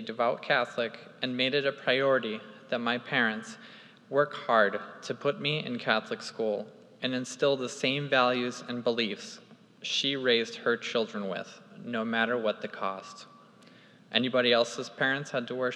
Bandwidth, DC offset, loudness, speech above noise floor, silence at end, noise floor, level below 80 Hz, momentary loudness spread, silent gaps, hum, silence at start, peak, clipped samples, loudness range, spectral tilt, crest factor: 11 kHz; under 0.1%; -29 LUFS; 26 dB; 0 s; -56 dBFS; under -90 dBFS; 14 LU; none; none; 0 s; -8 dBFS; under 0.1%; 2 LU; -4 dB/octave; 22 dB